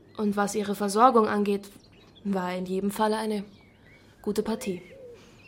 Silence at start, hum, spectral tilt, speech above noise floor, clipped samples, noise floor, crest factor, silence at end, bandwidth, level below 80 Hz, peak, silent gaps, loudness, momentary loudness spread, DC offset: 0.15 s; none; -5.5 dB/octave; 29 dB; under 0.1%; -55 dBFS; 22 dB; 0.35 s; 16.5 kHz; -62 dBFS; -6 dBFS; none; -27 LUFS; 18 LU; under 0.1%